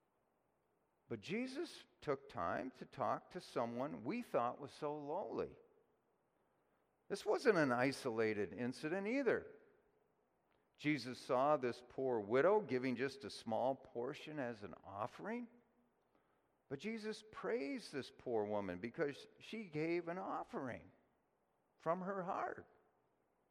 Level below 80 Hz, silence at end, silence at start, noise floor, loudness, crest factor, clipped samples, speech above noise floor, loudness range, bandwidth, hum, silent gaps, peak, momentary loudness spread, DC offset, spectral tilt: -82 dBFS; 0.85 s; 1.1 s; -82 dBFS; -42 LUFS; 22 dB; under 0.1%; 40 dB; 8 LU; 14.5 kHz; none; none; -20 dBFS; 13 LU; under 0.1%; -6 dB/octave